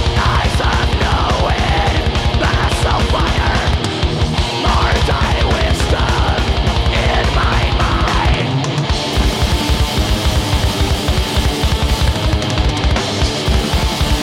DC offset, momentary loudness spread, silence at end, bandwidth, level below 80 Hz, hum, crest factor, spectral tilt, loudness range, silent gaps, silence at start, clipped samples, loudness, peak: under 0.1%; 2 LU; 0 s; 16 kHz; -18 dBFS; none; 14 dB; -5 dB/octave; 1 LU; none; 0 s; under 0.1%; -15 LUFS; 0 dBFS